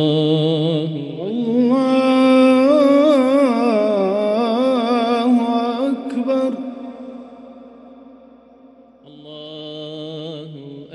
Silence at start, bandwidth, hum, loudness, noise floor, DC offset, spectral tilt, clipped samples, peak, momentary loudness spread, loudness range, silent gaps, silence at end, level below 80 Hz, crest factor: 0 s; 11.5 kHz; none; -16 LUFS; -46 dBFS; under 0.1%; -7 dB/octave; under 0.1%; -4 dBFS; 20 LU; 20 LU; none; 0 s; -66 dBFS; 14 dB